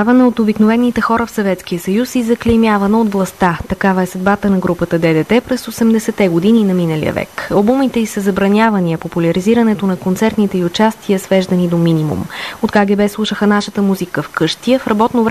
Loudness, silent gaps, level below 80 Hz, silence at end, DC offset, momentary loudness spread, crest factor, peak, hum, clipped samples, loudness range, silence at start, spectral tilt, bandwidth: -14 LUFS; none; -40 dBFS; 0 s; 0.2%; 6 LU; 12 dB; 0 dBFS; none; under 0.1%; 1 LU; 0 s; -6.5 dB/octave; 14 kHz